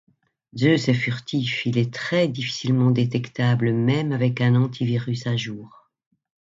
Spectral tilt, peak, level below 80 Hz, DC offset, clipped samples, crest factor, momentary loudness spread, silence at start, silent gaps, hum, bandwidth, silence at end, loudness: -6.5 dB/octave; -6 dBFS; -60 dBFS; under 0.1%; under 0.1%; 16 dB; 6 LU; 0.55 s; none; none; 7.6 kHz; 0.9 s; -22 LUFS